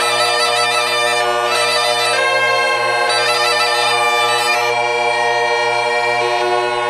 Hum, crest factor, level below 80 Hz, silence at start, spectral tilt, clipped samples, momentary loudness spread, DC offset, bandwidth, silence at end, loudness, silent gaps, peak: none; 14 dB; -60 dBFS; 0 s; -1 dB/octave; under 0.1%; 2 LU; under 0.1%; 14 kHz; 0 s; -14 LUFS; none; -2 dBFS